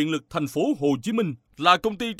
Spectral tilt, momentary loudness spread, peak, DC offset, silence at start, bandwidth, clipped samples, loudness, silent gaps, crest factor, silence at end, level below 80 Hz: -5 dB/octave; 8 LU; -4 dBFS; under 0.1%; 0 s; 15.5 kHz; under 0.1%; -24 LUFS; none; 20 dB; 0.05 s; -58 dBFS